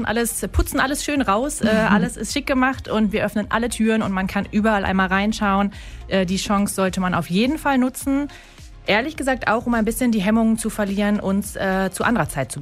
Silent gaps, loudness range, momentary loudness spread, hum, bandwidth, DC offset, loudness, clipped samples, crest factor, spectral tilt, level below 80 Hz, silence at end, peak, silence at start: none; 1 LU; 4 LU; none; 16 kHz; under 0.1%; -20 LUFS; under 0.1%; 16 dB; -5 dB/octave; -36 dBFS; 0 s; -4 dBFS; 0 s